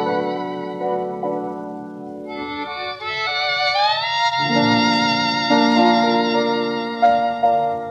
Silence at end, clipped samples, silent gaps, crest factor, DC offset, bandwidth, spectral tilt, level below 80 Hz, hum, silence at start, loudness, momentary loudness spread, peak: 0 s; under 0.1%; none; 16 dB; under 0.1%; 8.8 kHz; -4.5 dB/octave; -62 dBFS; none; 0 s; -19 LUFS; 13 LU; -4 dBFS